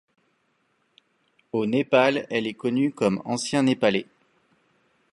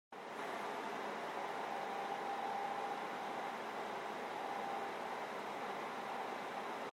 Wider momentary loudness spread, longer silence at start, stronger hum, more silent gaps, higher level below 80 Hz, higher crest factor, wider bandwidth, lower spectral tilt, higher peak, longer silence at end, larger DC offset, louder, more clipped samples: first, 8 LU vs 3 LU; first, 1.55 s vs 0.1 s; neither; neither; first, -68 dBFS vs -88 dBFS; first, 22 dB vs 14 dB; second, 11.5 kHz vs 16 kHz; first, -5 dB/octave vs -3.5 dB/octave; first, -4 dBFS vs -30 dBFS; first, 1.1 s vs 0 s; neither; first, -24 LUFS vs -43 LUFS; neither